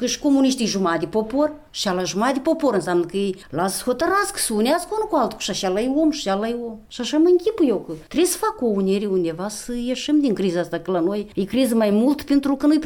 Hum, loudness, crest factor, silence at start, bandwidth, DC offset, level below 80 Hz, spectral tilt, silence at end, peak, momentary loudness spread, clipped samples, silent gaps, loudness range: none; -21 LUFS; 12 dB; 0 s; 18 kHz; under 0.1%; -50 dBFS; -4.5 dB/octave; 0 s; -8 dBFS; 8 LU; under 0.1%; none; 1 LU